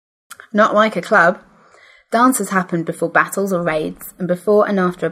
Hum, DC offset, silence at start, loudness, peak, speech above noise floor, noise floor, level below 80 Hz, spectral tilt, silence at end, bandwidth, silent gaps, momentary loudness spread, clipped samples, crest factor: none; under 0.1%; 0.55 s; -16 LUFS; 0 dBFS; 32 dB; -48 dBFS; -58 dBFS; -5 dB/octave; 0 s; 16 kHz; none; 9 LU; under 0.1%; 16 dB